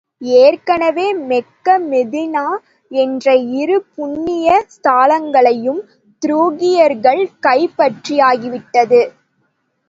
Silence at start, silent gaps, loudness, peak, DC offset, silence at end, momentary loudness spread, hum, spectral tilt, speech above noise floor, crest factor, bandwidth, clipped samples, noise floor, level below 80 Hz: 0.2 s; none; -14 LUFS; 0 dBFS; under 0.1%; 0.8 s; 9 LU; none; -4.5 dB/octave; 51 dB; 14 dB; 7.8 kHz; under 0.1%; -64 dBFS; -60 dBFS